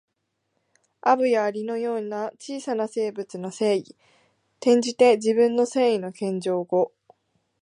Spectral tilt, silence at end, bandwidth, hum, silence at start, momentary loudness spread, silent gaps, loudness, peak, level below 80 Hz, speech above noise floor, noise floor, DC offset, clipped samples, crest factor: -5 dB/octave; 0.75 s; 11 kHz; none; 1.05 s; 11 LU; none; -23 LUFS; -6 dBFS; -78 dBFS; 54 dB; -77 dBFS; under 0.1%; under 0.1%; 18 dB